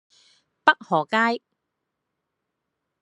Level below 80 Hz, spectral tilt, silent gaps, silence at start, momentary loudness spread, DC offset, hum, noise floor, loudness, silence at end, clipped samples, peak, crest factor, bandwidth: -78 dBFS; -5 dB/octave; none; 0.65 s; 4 LU; under 0.1%; none; -81 dBFS; -22 LUFS; 1.65 s; under 0.1%; -2 dBFS; 26 dB; 11 kHz